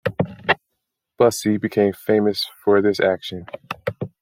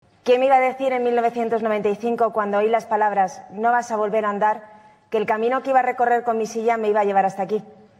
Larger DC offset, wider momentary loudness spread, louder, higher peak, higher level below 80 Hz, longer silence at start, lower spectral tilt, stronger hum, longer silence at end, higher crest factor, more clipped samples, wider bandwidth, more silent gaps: neither; first, 12 LU vs 6 LU; about the same, -20 LUFS vs -21 LUFS; first, -2 dBFS vs -6 dBFS; first, -60 dBFS vs -72 dBFS; second, 0.05 s vs 0.25 s; about the same, -5 dB/octave vs -5 dB/octave; neither; second, 0.15 s vs 0.3 s; first, 20 dB vs 14 dB; neither; first, 16.5 kHz vs 12.5 kHz; neither